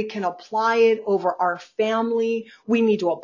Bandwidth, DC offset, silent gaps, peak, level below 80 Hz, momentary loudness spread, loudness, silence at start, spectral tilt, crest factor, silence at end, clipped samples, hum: 7.2 kHz; under 0.1%; none; -6 dBFS; -72 dBFS; 8 LU; -22 LUFS; 0 s; -6 dB/octave; 14 dB; 0 s; under 0.1%; none